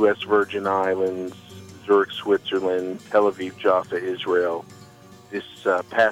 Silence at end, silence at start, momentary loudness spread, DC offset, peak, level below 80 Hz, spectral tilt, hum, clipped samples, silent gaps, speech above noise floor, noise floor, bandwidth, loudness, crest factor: 0 s; 0 s; 13 LU; under 0.1%; -6 dBFS; -68 dBFS; -5 dB/octave; none; under 0.1%; none; 25 dB; -47 dBFS; 12.5 kHz; -23 LUFS; 16 dB